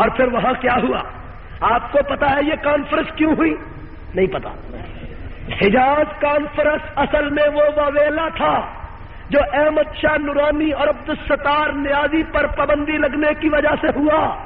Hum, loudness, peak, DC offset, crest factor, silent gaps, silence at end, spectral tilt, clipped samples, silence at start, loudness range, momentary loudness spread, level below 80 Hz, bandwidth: none; -18 LUFS; -4 dBFS; under 0.1%; 14 dB; none; 0 s; -3.5 dB/octave; under 0.1%; 0 s; 3 LU; 16 LU; -34 dBFS; 4.9 kHz